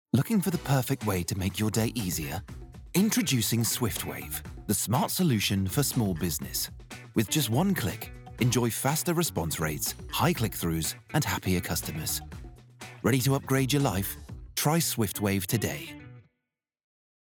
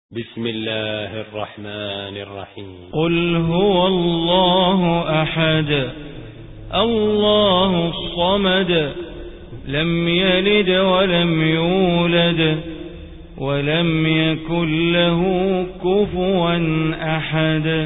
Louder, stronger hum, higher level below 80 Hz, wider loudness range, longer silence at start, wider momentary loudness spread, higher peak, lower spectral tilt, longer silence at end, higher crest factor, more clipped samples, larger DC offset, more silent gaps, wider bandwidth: second, -28 LUFS vs -18 LUFS; neither; second, -50 dBFS vs -40 dBFS; about the same, 2 LU vs 3 LU; about the same, 0.15 s vs 0.1 s; second, 11 LU vs 17 LU; second, -12 dBFS vs -4 dBFS; second, -4.5 dB/octave vs -11.5 dB/octave; first, 1.15 s vs 0 s; about the same, 18 dB vs 14 dB; neither; neither; neither; first, over 20 kHz vs 4 kHz